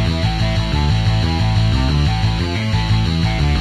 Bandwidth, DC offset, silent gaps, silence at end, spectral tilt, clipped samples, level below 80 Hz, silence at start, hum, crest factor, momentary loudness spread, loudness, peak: 10.5 kHz; under 0.1%; none; 0 s; -6 dB/octave; under 0.1%; -22 dBFS; 0 s; none; 12 dB; 2 LU; -17 LUFS; -4 dBFS